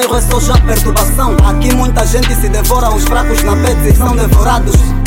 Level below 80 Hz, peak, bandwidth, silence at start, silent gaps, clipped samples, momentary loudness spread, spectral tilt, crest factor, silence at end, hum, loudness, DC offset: -10 dBFS; 0 dBFS; 17 kHz; 0 s; none; under 0.1%; 2 LU; -5 dB/octave; 8 dB; 0 s; none; -11 LUFS; under 0.1%